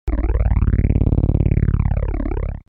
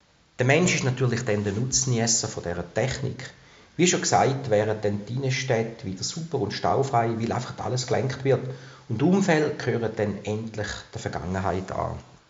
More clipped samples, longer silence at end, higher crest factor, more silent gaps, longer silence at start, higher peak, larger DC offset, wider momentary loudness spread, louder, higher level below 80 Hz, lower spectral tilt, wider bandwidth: neither; second, 0.1 s vs 0.25 s; second, 14 dB vs 20 dB; neither; second, 0.05 s vs 0.4 s; first, -2 dBFS vs -6 dBFS; neither; second, 6 LU vs 11 LU; first, -19 LUFS vs -25 LUFS; first, -20 dBFS vs -54 dBFS; first, -12 dB/octave vs -5 dB/octave; second, 3 kHz vs 8 kHz